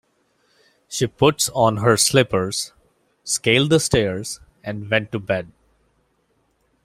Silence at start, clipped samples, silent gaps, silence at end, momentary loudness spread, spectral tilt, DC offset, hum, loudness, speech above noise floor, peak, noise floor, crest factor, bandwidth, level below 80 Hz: 0.9 s; under 0.1%; none; 1.35 s; 16 LU; -4 dB/octave; under 0.1%; none; -19 LUFS; 47 dB; 0 dBFS; -66 dBFS; 20 dB; 16 kHz; -50 dBFS